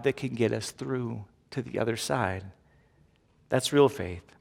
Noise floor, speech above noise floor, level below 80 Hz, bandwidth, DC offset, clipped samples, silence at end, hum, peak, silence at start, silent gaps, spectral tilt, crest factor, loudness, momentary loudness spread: -64 dBFS; 35 dB; -62 dBFS; 16.5 kHz; under 0.1%; under 0.1%; 0.2 s; none; -8 dBFS; 0 s; none; -5 dB/octave; 22 dB; -29 LUFS; 15 LU